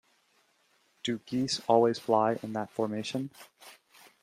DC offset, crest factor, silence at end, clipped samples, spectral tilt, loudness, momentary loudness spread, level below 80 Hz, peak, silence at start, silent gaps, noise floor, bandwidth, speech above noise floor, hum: under 0.1%; 22 dB; 0.5 s; under 0.1%; -5 dB/octave; -30 LUFS; 14 LU; -72 dBFS; -10 dBFS; 1.05 s; none; -70 dBFS; 15.5 kHz; 40 dB; none